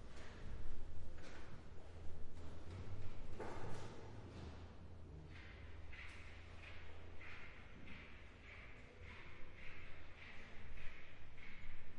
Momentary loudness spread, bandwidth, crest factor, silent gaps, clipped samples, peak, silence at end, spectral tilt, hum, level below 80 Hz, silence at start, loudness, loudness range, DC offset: 6 LU; 7.6 kHz; 14 dB; none; under 0.1%; -30 dBFS; 0 s; -5.5 dB/octave; none; -56 dBFS; 0 s; -56 LUFS; 3 LU; under 0.1%